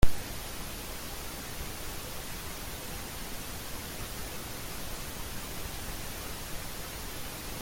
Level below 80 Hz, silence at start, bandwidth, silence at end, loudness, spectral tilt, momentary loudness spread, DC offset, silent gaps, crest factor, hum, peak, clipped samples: -42 dBFS; 0 s; 17 kHz; 0 s; -39 LUFS; -3 dB/octave; 1 LU; under 0.1%; none; 24 dB; none; -8 dBFS; under 0.1%